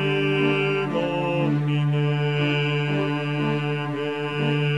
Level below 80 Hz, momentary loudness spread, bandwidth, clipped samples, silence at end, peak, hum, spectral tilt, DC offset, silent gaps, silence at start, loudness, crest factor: -66 dBFS; 5 LU; 7.8 kHz; under 0.1%; 0 s; -10 dBFS; none; -7.5 dB/octave; 0.3%; none; 0 s; -23 LUFS; 14 dB